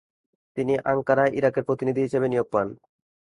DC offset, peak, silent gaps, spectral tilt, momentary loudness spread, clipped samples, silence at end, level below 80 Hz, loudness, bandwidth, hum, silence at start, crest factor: under 0.1%; -6 dBFS; none; -8 dB/octave; 8 LU; under 0.1%; 0.5 s; -62 dBFS; -24 LUFS; 10.5 kHz; none; 0.55 s; 18 dB